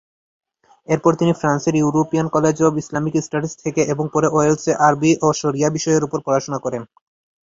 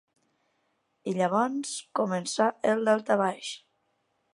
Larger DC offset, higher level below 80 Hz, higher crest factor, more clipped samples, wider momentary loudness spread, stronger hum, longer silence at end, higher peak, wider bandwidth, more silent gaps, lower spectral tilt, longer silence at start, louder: neither; first, -56 dBFS vs -82 dBFS; about the same, 16 dB vs 20 dB; neither; second, 7 LU vs 13 LU; neither; about the same, 0.7 s vs 0.8 s; first, -2 dBFS vs -8 dBFS; second, 7.8 kHz vs 11.5 kHz; neither; first, -6 dB/octave vs -4.5 dB/octave; second, 0.9 s vs 1.05 s; first, -18 LUFS vs -27 LUFS